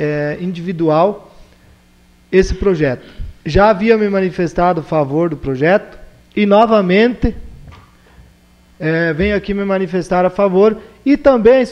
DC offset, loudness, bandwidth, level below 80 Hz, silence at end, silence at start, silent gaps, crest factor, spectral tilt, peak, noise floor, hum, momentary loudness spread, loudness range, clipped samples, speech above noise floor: under 0.1%; -14 LUFS; 9.6 kHz; -32 dBFS; 0 s; 0 s; none; 14 dB; -7.5 dB/octave; 0 dBFS; -48 dBFS; none; 11 LU; 4 LU; under 0.1%; 35 dB